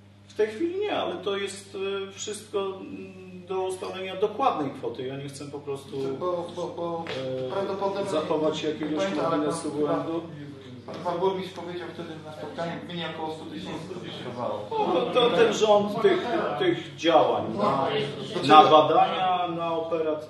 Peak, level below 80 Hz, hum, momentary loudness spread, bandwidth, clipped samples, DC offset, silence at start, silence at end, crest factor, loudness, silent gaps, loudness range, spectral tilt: -2 dBFS; -66 dBFS; none; 15 LU; 12.5 kHz; under 0.1%; under 0.1%; 0.3 s; 0 s; 24 dB; -26 LUFS; none; 11 LU; -5 dB/octave